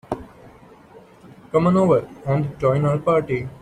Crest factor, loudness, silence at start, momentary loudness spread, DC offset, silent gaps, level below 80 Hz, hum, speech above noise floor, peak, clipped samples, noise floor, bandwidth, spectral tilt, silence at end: 16 dB; -20 LUFS; 0.1 s; 9 LU; under 0.1%; none; -50 dBFS; none; 28 dB; -6 dBFS; under 0.1%; -47 dBFS; 9.8 kHz; -9 dB/octave; 0.1 s